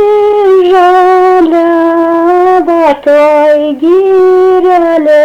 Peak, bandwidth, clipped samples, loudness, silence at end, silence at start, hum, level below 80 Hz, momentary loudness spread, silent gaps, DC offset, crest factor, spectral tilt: 0 dBFS; 8.2 kHz; under 0.1%; -6 LUFS; 0 s; 0 s; none; -46 dBFS; 3 LU; none; under 0.1%; 6 dB; -5 dB/octave